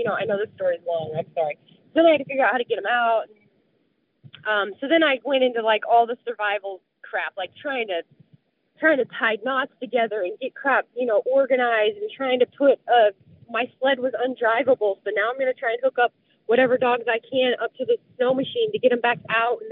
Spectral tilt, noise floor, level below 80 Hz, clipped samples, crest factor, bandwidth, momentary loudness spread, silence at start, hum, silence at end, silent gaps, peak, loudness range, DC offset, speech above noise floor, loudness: -1 dB/octave; -68 dBFS; -80 dBFS; under 0.1%; 16 dB; 4.2 kHz; 9 LU; 0 s; none; 0 s; none; -6 dBFS; 4 LU; under 0.1%; 46 dB; -22 LUFS